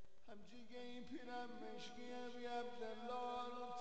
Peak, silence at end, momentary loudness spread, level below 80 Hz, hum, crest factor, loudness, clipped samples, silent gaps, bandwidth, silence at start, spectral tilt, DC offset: -34 dBFS; 0 s; 13 LU; -78 dBFS; none; 16 dB; -51 LUFS; under 0.1%; none; 8.4 kHz; 0 s; -4 dB/octave; 0.2%